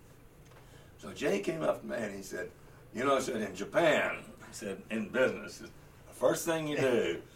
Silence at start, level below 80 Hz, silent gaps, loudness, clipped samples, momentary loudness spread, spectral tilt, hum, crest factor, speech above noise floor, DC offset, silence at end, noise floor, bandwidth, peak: 0.05 s; -62 dBFS; none; -32 LUFS; under 0.1%; 17 LU; -4.5 dB/octave; none; 20 dB; 23 dB; under 0.1%; 0 s; -56 dBFS; 16.5 kHz; -14 dBFS